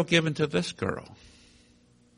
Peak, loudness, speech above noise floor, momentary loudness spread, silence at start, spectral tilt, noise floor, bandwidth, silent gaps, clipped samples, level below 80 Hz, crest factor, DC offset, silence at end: -8 dBFS; -28 LUFS; 33 dB; 16 LU; 0 s; -5 dB/octave; -61 dBFS; 10.5 kHz; none; under 0.1%; -60 dBFS; 22 dB; under 0.1%; 1.05 s